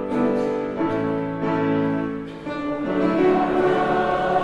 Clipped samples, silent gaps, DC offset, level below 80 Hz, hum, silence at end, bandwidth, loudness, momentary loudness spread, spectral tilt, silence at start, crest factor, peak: under 0.1%; none; under 0.1%; -50 dBFS; none; 0 s; 9.8 kHz; -22 LUFS; 9 LU; -8 dB/octave; 0 s; 14 dB; -6 dBFS